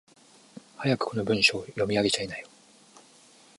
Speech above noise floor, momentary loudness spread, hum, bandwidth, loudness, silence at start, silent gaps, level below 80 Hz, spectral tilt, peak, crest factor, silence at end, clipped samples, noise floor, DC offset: 30 dB; 11 LU; none; 11.5 kHz; -26 LUFS; 0.55 s; none; -62 dBFS; -4 dB/octave; -8 dBFS; 22 dB; 1.1 s; under 0.1%; -56 dBFS; under 0.1%